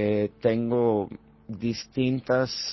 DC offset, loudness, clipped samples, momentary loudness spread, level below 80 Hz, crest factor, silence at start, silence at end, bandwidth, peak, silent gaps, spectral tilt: under 0.1%; -26 LUFS; under 0.1%; 12 LU; -58 dBFS; 16 dB; 0 s; 0 s; 6.2 kHz; -10 dBFS; none; -6 dB/octave